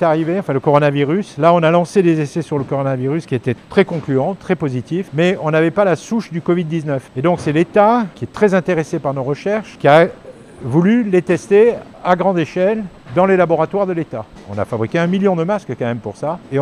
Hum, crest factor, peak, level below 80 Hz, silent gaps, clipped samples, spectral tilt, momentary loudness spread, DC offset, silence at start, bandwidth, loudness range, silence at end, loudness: none; 16 dB; 0 dBFS; -52 dBFS; none; under 0.1%; -7.5 dB/octave; 10 LU; under 0.1%; 0 s; 11 kHz; 3 LU; 0 s; -16 LUFS